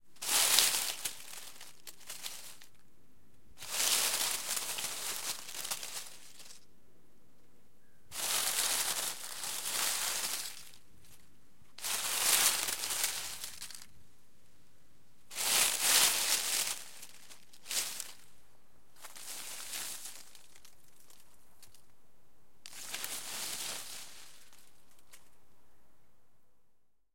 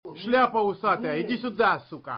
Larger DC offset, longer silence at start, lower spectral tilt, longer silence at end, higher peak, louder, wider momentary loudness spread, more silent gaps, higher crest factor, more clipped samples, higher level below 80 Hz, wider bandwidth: first, 0.4% vs under 0.1%; about the same, 0 s vs 0.05 s; second, 2 dB/octave vs -3 dB/octave; about the same, 0 s vs 0 s; first, -4 dBFS vs -12 dBFS; second, -32 LUFS vs -25 LUFS; first, 24 LU vs 7 LU; neither; first, 34 dB vs 14 dB; neither; second, -76 dBFS vs -64 dBFS; first, 17 kHz vs 5.6 kHz